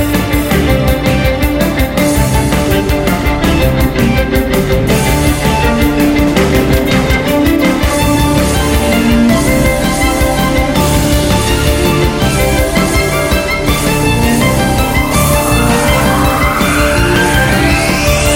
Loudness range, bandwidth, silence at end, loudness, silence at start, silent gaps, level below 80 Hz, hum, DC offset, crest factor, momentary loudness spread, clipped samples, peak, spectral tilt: 1 LU; 16.5 kHz; 0 s; -11 LUFS; 0 s; none; -18 dBFS; none; under 0.1%; 10 dB; 2 LU; under 0.1%; 0 dBFS; -5 dB/octave